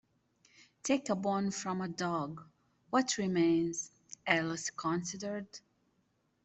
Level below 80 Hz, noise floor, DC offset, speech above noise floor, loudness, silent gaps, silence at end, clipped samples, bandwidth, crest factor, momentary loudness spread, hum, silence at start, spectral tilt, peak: -74 dBFS; -76 dBFS; under 0.1%; 43 dB; -34 LUFS; none; 0.85 s; under 0.1%; 8.4 kHz; 24 dB; 13 LU; none; 0.85 s; -4 dB/octave; -12 dBFS